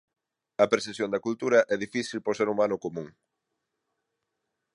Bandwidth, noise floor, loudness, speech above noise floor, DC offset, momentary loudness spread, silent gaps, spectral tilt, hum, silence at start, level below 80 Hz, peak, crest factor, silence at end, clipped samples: 11 kHz; -82 dBFS; -27 LUFS; 56 dB; under 0.1%; 14 LU; none; -4.5 dB/octave; none; 0.6 s; -72 dBFS; -6 dBFS; 22 dB; 1.65 s; under 0.1%